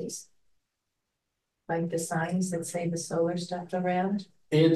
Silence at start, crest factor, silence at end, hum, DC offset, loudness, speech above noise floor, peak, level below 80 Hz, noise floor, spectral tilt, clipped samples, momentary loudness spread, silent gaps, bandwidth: 0 s; 20 dB; 0 s; none; under 0.1%; -30 LUFS; 53 dB; -10 dBFS; -72 dBFS; -83 dBFS; -5.5 dB/octave; under 0.1%; 6 LU; none; 12.5 kHz